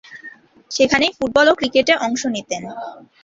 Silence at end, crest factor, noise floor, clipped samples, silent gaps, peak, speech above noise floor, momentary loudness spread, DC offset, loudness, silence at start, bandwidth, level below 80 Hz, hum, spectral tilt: 0.25 s; 18 dB; -42 dBFS; under 0.1%; none; -2 dBFS; 24 dB; 19 LU; under 0.1%; -17 LUFS; 0.1 s; 7.8 kHz; -52 dBFS; none; -3 dB/octave